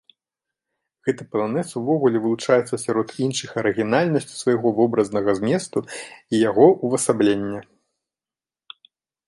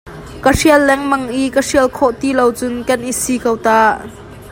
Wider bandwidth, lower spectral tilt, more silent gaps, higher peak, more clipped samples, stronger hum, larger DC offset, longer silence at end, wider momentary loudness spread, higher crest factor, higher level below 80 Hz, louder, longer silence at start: second, 11.5 kHz vs 16.5 kHz; first, -5.5 dB/octave vs -4 dB/octave; neither; about the same, -2 dBFS vs 0 dBFS; neither; neither; neither; first, 1.65 s vs 0 s; about the same, 10 LU vs 8 LU; first, 20 dB vs 14 dB; second, -62 dBFS vs -36 dBFS; second, -21 LUFS vs -14 LUFS; first, 1.05 s vs 0.05 s